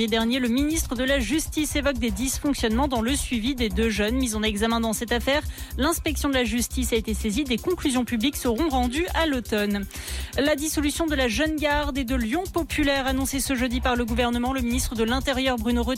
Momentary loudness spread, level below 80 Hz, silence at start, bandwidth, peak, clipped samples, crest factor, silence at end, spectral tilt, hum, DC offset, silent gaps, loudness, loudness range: 3 LU; -34 dBFS; 0 s; 16.5 kHz; -12 dBFS; under 0.1%; 12 dB; 0 s; -4 dB/octave; none; under 0.1%; none; -24 LUFS; 1 LU